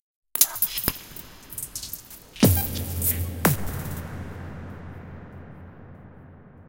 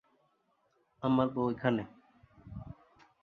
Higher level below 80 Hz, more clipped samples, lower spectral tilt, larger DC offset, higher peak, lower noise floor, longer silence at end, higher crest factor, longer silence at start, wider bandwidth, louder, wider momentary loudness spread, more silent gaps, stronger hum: first, -44 dBFS vs -62 dBFS; neither; second, -4 dB/octave vs -9 dB/octave; neither; first, 0 dBFS vs -14 dBFS; second, -47 dBFS vs -74 dBFS; second, 0 s vs 0.5 s; first, 28 dB vs 22 dB; second, 0.35 s vs 1 s; first, 17 kHz vs 4.8 kHz; first, -24 LUFS vs -32 LUFS; first, 23 LU vs 20 LU; neither; neither